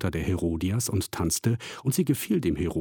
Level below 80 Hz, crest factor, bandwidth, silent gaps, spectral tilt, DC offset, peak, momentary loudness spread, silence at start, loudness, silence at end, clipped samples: -44 dBFS; 16 dB; 18 kHz; none; -5.5 dB/octave; under 0.1%; -12 dBFS; 3 LU; 0 s; -27 LUFS; 0 s; under 0.1%